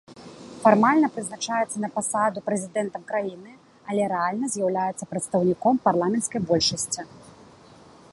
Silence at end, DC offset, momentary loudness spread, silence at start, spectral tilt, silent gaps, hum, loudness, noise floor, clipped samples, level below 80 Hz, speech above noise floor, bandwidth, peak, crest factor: 0.8 s; under 0.1%; 11 LU; 0.1 s; -4 dB/octave; none; none; -24 LUFS; -50 dBFS; under 0.1%; -62 dBFS; 26 dB; 11.5 kHz; -2 dBFS; 22 dB